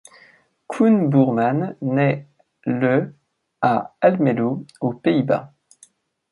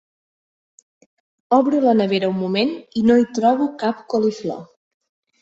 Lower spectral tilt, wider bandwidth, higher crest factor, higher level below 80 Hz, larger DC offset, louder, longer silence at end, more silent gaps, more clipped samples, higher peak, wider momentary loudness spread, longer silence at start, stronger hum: first, -8.5 dB/octave vs -6.5 dB/octave; first, 11.5 kHz vs 7.8 kHz; about the same, 18 dB vs 18 dB; about the same, -66 dBFS vs -62 dBFS; neither; about the same, -20 LUFS vs -19 LUFS; about the same, 0.85 s vs 0.75 s; neither; neither; about the same, -2 dBFS vs -4 dBFS; about the same, 10 LU vs 8 LU; second, 0.7 s vs 1.5 s; neither